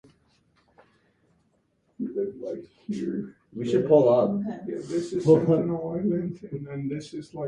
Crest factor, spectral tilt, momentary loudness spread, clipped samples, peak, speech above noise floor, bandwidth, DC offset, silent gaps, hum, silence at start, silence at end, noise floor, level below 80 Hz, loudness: 20 dB; -8.5 dB/octave; 17 LU; under 0.1%; -6 dBFS; 44 dB; 10 kHz; under 0.1%; none; none; 2 s; 0 s; -69 dBFS; -62 dBFS; -26 LUFS